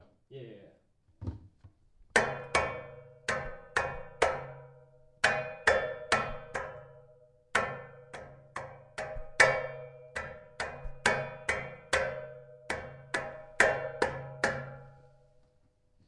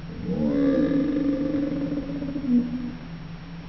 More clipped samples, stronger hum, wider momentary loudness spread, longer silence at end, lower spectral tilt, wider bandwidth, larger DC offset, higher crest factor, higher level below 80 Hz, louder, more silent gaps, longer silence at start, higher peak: neither; neither; first, 21 LU vs 15 LU; first, 1 s vs 0 s; second, -3 dB/octave vs -9.5 dB/octave; first, 11.5 kHz vs 5.4 kHz; second, under 0.1% vs 0.2%; first, 28 dB vs 14 dB; second, -54 dBFS vs -42 dBFS; second, -32 LUFS vs -25 LUFS; neither; first, 0.3 s vs 0 s; first, -6 dBFS vs -12 dBFS